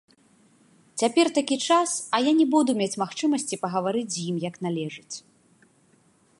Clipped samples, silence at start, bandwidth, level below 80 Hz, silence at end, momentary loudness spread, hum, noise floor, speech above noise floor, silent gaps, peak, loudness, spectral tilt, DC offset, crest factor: under 0.1%; 0.95 s; 11.5 kHz; -78 dBFS; 1.2 s; 12 LU; none; -62 dBFS; 37 dB; none; -6 dBFS; -24 LUFS; -4 dB/octave; under 0.1%; 20 dB